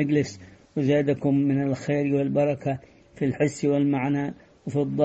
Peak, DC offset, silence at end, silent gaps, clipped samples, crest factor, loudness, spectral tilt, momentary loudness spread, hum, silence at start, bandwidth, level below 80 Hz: -8 dBFS; under 0.1%; 0 s; none; under 0.1%; 16 dB; -25 LUFS; -7.5 dB/octave; 11 LU; none; 0 s; 8.6 kHz; -60 dBFS